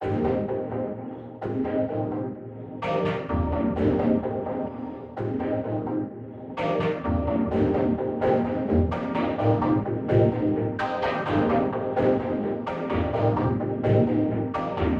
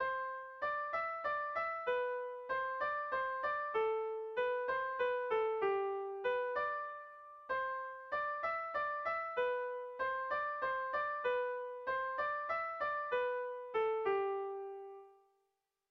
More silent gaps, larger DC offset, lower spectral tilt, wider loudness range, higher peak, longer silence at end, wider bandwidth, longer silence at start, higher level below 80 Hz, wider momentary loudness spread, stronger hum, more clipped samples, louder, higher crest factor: neither; neither; first, -9.5 dB/octave vs -5 dB/octave; first, 5 LU vs 2 LU; first, -8 dBFS vs -24 dBFS; second, 0 s vs 0.8 s; first, 6.8 kHz vs 6 kHz; about the same, 0 s vs 0 s; first, -42 dBFS vs -76 dBFS; first, 10 LU vs 6 LU; neither; neither; first, -26 LUFS vs -38 LUFS; about the same, 16 dB vs 14 dB